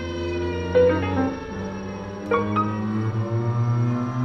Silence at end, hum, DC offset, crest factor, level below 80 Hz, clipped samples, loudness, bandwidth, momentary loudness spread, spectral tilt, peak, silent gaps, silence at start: 0 s; none; under 0.1%; 16 dB; -46 dBFS; under 0.1%; -24 LUFS; 6.4 kHz; 12 LU; -8.5 dB/octave; -8 dBFS; none; 0 s